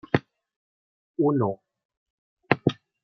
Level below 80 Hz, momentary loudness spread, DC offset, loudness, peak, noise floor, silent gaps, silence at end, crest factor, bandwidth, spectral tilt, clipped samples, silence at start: -66 dBFS; 12 LU; under 0.1%; -26 LUFS; -2 dBFS; under -90 dBFS; 0.56-1.14 s, 1.85-1.89 s, 1.97-2.37 s; 0.3 s; 26 dB; 6.4 kHz; -8.5 dB/octave; under 0.1%; 0.15 s